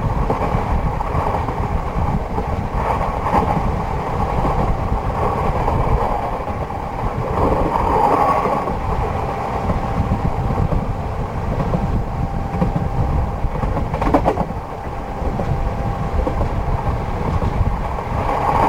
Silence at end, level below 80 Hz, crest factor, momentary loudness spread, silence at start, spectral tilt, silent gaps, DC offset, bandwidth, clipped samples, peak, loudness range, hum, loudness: 0 s; -24 dBFS; 18 dB; 6 LU; 0 s; -8 dB/octave; none; under 0.1%; 15.5 kHz; under 0.1%; -2 dBFS; 3 LU; none; -20 LUFS